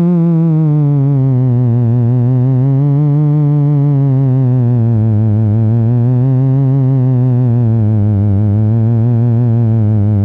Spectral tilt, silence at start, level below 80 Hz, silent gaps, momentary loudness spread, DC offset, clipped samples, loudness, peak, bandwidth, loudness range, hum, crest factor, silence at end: -13 dB/octave; 0 s; -42 dBFS; none; 1 LU; under 0.1%; under 0.1%; -11 LUFS; -6 dBFS; 2.6 kHz; 0 LU; none; 4 dB; 0 s